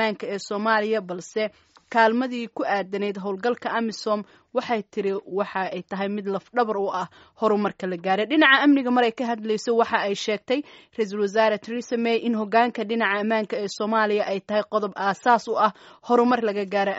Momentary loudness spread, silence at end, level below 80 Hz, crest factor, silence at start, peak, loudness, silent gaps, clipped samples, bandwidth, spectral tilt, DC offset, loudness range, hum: 9 LU; 0 s; -72 dBFS; 20 dB; 0 s; -2 dBFS; -23 LUFS; none; under 0.1%; 8 kHz; -2.5 dB/octave; under 0.1%; 6 LU; none